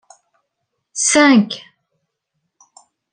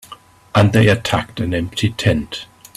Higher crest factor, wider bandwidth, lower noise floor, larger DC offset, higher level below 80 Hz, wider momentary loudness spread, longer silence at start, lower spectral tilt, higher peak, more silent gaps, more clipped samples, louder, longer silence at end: about the same, 18 dB vs 18 dB; second, 10.5 kHz vs 14 kHz; first, -75 dBFS vs -42 dBFS; neither; second, -62 dBFS vs -42 dBFS; first, 19 LU vs 9 LU; first, 0.95 s vs 0.1 s; second, -3 dB/octave vs -6 dB/octave; about the same, -2 dBFS vs 0 dBFS; neither; neither; first, -13 LUFS vs -17 LUFS; first, 1.55 s vs 0.3 s